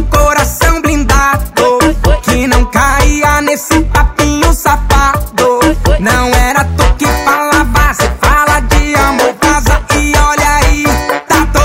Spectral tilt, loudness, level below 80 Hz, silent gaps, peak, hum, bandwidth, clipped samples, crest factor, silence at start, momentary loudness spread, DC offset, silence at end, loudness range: -4.5 dB/octave; -10 LUFS; -14 dBFS; none; 0 dBFS; none; 16.5 kHz; under 0.1%; 8 dB; 0 s; 2 LU; under 0.1%; 0 s; 1 LU